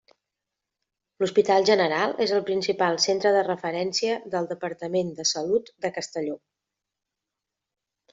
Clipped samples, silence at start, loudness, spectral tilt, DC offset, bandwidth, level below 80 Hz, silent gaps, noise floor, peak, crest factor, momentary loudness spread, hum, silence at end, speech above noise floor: under 0.1%; 1.2 s; -24 LUFS; -3.5 dB/octave; under 0.1%; 8 kHz; -72 dBFS; none; -86 dBFS; -6 dBFS; 20 dB; 11 LU; none; 1.75 s; 62 dB